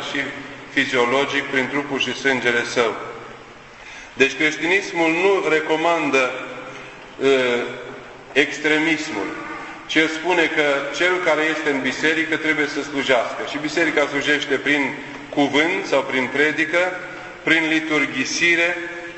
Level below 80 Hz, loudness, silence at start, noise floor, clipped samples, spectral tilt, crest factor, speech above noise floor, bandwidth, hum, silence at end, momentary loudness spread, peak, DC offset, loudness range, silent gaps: -58 dBFS; -19 LUFS; 0 s; -41 dBFS; under 0.1%; -3.5 dB/octave; 20 dB; 21 dB; 8.4 kHz; none; 0 s; 15 LU; 0 dBFS; under 0.1%; 2 LU; none